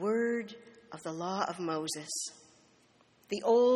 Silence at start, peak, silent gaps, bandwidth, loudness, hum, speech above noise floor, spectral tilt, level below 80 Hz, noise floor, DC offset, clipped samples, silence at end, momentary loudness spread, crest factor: 0 s; -16 dBFS; none; 13 kHz; -34 LUFS; none; 35 dB; -4 dB/octave; -80 dBFS; -66 dBFS; under 0.1%; under 0.1%; 0 s; 16 LU; 16 dB